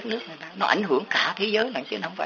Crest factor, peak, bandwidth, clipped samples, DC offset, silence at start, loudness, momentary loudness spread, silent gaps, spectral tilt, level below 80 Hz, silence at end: 22 dB; -4 dBFS; 7.2 kHz; under 0.1%; under 0.1%; 0 s; -24 LUFS; 10 LU; none; -1 dB/octave; -74 dBFS; 0 s